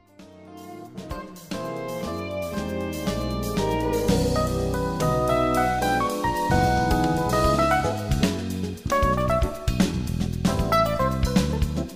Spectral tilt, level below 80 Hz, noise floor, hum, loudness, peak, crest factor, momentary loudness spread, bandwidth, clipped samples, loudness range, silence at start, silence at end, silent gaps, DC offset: -6 dB/octave; -34 dBFS; -47 dBFS; none; -24 LUFS; -6 dBFS; 18 dB; 10 LU; 16 kHz; under 0.1%; 7 LU; 0.2 s; 0 s; none; under 0.1%